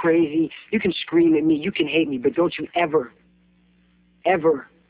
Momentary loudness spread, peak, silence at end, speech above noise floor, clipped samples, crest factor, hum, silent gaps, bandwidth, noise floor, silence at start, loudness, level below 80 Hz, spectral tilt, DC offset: 7 LU; -8 dBFS; 0.25 s; 39 dB; under 0.1%; 14 dB; none; none; 4 kHz; -59 dBFS; 0 s; -21 LUFS; -58 dBFS; -10 dB/octave; under 0.1%